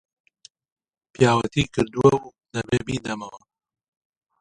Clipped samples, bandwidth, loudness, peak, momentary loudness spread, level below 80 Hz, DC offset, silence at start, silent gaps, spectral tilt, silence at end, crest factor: under 0.1%; 11 kHz; -22 LUFS; -2 dBFS; 14 LU; -50 dBFS; under 0.1%; 1.2 s; none; -6 dB/octave; 1.05 s; 22 dB